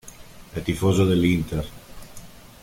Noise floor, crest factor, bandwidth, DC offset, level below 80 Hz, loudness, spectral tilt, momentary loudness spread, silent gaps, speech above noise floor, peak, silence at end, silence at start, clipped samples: -43 dBFS; 18 dB; 16.5 kHz; under 0.1%; -42 dBFS; -22 LUFS; -6.5 dB/octave; 25 LU; none; 22 dB; -8 dBFS; 0.25 s; 0.05 s; under 0.1%